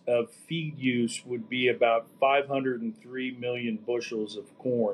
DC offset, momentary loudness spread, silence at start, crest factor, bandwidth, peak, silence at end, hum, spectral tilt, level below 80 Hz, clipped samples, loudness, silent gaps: under 0.1%; 11 LU; 0.05 s; 18 dB; 12 kHz; -12 dBFS; 0 s; none; -5 dB/octave; -84 dBFS; under 0.1%; -29 LUFS; none